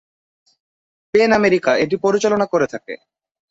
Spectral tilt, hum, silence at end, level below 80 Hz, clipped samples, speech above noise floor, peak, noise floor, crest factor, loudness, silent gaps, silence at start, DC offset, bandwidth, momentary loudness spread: -5 dB/octave; none; 0.55 s; -56 dBFS; under 0.1%; over 74 dB; -2 dBFS; under -90 dBFS; 16 dB; -17 LUFS; none; 1.15 s; under 0.1%; 7.8 kHz; 16 LU